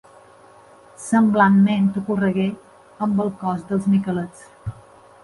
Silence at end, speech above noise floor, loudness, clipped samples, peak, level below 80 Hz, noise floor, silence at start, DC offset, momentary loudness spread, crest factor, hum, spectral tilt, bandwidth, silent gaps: 0.5 s; 29 dB; -20 LUFS; under 0.1%; -4 dBFS; -54 dBFS; -48 dBFS; 1 s; under 0.1%; 21 LU; 16 dB; none; -7 dB/octave; 11.5 kHz; none